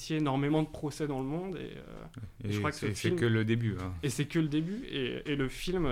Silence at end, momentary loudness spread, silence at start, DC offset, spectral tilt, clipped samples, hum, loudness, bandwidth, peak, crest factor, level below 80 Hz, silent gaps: 0 s; 13 LU; 0 s; under 0.1%; -6 dB/octave; under 0.1%; none; -33 LUFS; 16 kHz; -18 dBFS; 14 dB; -50 dBFS; none